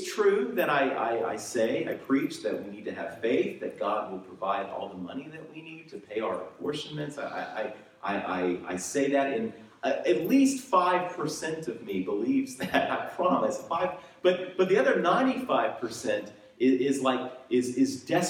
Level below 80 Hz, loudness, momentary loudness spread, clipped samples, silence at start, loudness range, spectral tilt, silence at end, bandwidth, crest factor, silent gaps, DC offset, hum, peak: -72 dBFS; -29 LUFS; 12 LU; under 0.1%; 0 s; 8 LU; -4.5 dB/octave; 0 s; 16 kHz; 18 dB; none; under 0.1%; none; -10 dBFS